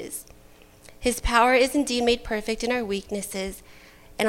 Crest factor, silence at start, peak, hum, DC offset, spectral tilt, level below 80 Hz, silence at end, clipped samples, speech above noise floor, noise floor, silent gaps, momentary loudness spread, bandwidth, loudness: 20 dB; 0 s; -6 dBFS; none; under 0.1%; -3 dB/octave; -40 dBFS; 0 s; under 0.1%; 27 dB; -51 dBFS; none; 17 LU; 16.5 kHz; -24 LUFS